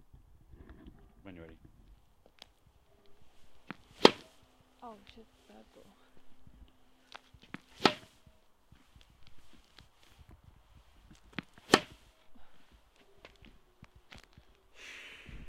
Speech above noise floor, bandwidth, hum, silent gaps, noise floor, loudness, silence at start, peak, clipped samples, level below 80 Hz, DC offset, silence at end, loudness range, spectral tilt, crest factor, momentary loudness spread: 9 dB; 16 kHz; none; none; -65 dBFS; -30 LUFS; 0.7 s; 0 dBFS; under 0.1%; -62 dBFS; under 0.1%; 0 s; 22 LU; -3.5 dB/octave; 40 dB; 31 LU